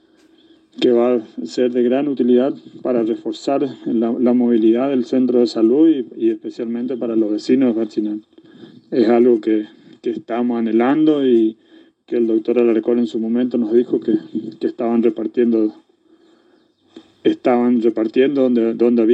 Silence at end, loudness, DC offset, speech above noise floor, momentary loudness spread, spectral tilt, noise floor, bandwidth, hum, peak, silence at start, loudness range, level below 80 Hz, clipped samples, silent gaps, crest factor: 0 s; -17 LUFS; under 0.1%; 40 dB; 9 LU; -7 dB/octave; -56 dBFS; 8 kHz; none; -4 dBFS; 0.8 s; 3 LU; -76 dBFS; under 0.1%; none; 14 dB